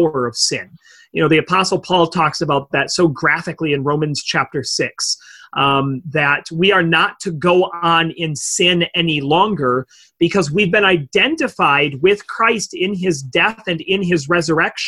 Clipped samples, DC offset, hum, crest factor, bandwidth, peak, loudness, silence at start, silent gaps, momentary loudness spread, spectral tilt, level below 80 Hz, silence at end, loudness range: under 0.1%; under 0.1%; none; 16 dB; 12.5 kHz; -2 dBFS; -16 LUFS; 0 s; none; 6 LU; -4 dB/octave; -52 dBFS; 0 s; 2 LU